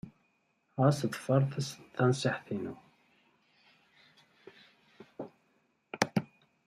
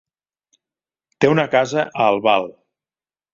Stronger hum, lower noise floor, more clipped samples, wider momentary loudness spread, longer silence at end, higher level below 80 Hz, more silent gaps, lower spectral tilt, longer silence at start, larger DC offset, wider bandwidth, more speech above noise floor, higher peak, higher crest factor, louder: neither; second, -74 dBFS vs under -90 dBFS; neither; first, 21 LU vs 5 LU; second, 0.4 s vs 0.85 s; second, -72 dBFS vs -62 dBFS; neither; about the same, -6 dB/octave vs -5.5 dB/octave; second, 0.05 s vs 1.2 s; neither; first, 14.5 kHz vs 7.6 kHz; second, 44 dB vs over 73 dB; second, -10 dBFS vs 0 dBFS; about the same, 24 dB vs 20 dB; second, -32 LUFS vs -17 LUFS